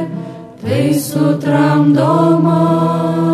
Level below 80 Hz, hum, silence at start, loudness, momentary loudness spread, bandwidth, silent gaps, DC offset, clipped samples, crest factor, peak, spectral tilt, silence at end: -56 dBFS; none; 0 s; -13 LUFS; 13 LU; 14 kHz; none; under 0.1%; under 0.1%; 12 dB; 0 dBFS; -7.5 dB/octave; 0 s